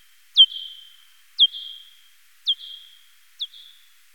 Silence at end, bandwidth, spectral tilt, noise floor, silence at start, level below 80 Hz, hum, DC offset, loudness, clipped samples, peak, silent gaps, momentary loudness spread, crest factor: 0.7 s; 18 kHz; 5.5 dB/octave; -57 dBFS; 0.35 s; under -90 dBFS; none; 0.2%; -18 LUFS; under 0.1%; -4 dBFS; none; 24 LU; 22 dB